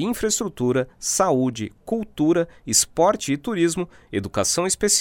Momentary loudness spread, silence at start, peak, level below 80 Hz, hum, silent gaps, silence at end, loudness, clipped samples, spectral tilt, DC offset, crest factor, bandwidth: 9 LU; 0 s; -4 dBFS; -50 dBFS; none; none; 0 s; -22 LUFS; under 0.1%; -3.5 dB/octave; under 0.1%; 18 dB; 19.5 kHz